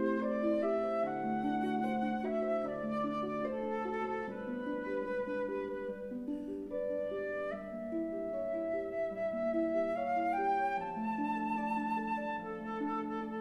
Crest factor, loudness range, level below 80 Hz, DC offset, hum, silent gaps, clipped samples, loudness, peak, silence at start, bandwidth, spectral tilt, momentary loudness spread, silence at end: 14 dB; 4 LU; -66 dBFS; under 0.1%; none; none; under 0.1%; -36 LUFS; -22 dBFS; 0 s; 11.5 kHz; -7.5 dB/octave; 7 LU; 0 s